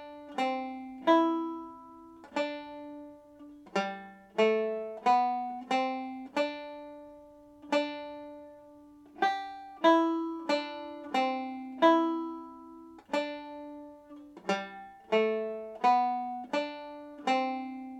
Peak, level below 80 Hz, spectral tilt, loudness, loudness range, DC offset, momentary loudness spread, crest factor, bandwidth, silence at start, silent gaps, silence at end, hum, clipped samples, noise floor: -10 dBFS; -74 dBFS; -4.5 dB/octave; -31 LUFS; 7 LU; under 0.1%; 22 LU; 22 dB; 9.6 kHz; 0 s; none; 0 s; none; under 0.1%; -54 dBFS